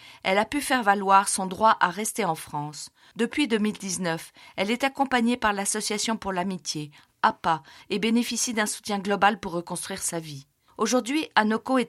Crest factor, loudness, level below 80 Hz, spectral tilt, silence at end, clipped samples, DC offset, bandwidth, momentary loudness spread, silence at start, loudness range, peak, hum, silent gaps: 20 dB; -25 LUFS; -60 dBFS; -3 dB/octave; 0 s; under 0.1%; under 0.1%; 16 kHz; 11 LU; 0 s; 3 LU; -4 dBFS; none; none